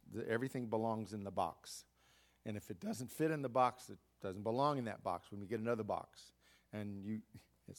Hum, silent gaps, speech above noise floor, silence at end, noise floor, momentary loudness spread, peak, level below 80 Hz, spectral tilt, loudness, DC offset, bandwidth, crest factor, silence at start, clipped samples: none; none; 31 dB; 0 s; -72 dBFS; 16 LU; -20 dBFS; -78 dBFS; -6 dB/octave; -41 LUFS; under 0.1%; 18 kHz; 20 dB; 0.05 s; under 0.1%